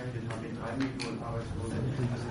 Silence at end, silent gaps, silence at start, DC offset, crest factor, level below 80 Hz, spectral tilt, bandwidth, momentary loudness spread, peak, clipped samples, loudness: 0 s; none; 0 s; under 0.1%; 14 dB; -50 dBFS; -6.5 dB/octave; 10.5 kHz; 5 LU; -20 dBFS; under 0.1%; -35 LUFS